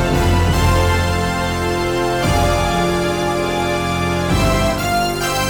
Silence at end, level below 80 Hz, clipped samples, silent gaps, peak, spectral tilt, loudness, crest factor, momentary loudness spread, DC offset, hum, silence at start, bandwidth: 0 s; -26 dBFS; under 0.1%; none; -6 dBFS; -5 dB/octave; -17 LUFS; 10 dB; 3 LU; under 0.1%; none; 0 s; over 20 kHz